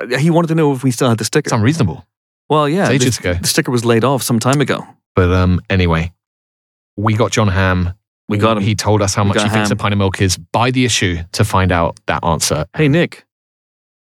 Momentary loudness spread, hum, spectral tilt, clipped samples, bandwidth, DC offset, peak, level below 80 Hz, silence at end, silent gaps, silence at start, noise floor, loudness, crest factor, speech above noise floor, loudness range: 6 LU; none; -5 dB/octave; under 0.1%; 16.5 kHz; under 0.1%; -2 dBFS; -38 dBFS; 0.95 s; 2.17-2.49 s, 5.06-5.15 s, 6.27-6.97 s, 8.07-8.28 s; 0 s; under -90 dBFS; -15 LUFS; 14 dB; over 76 dB; 2 LU